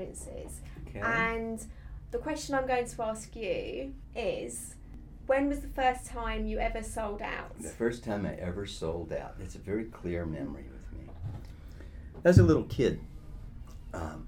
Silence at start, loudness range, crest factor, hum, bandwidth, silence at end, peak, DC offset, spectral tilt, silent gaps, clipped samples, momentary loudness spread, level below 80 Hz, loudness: 0 s; 8 LU; 26 dB; none; 16.5 kHz; 0 s; -6 dBFS; under 0.1%; -6 dB/octave; none; under 0.1%; 18 LU; -44 dBFS; -32 LUFS